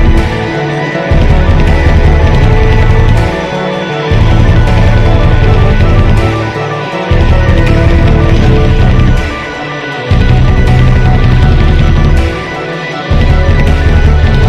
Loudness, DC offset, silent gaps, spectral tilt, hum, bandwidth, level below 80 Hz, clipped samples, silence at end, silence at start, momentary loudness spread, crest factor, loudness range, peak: -9 LUFS; under 0.1%; none; -7.5 dB/octave; none; 7.8 kHz; -10 dBFS; 3%; 0 s; 0 s; 6 LU; 6 dB; 0 LU; 0 dBFS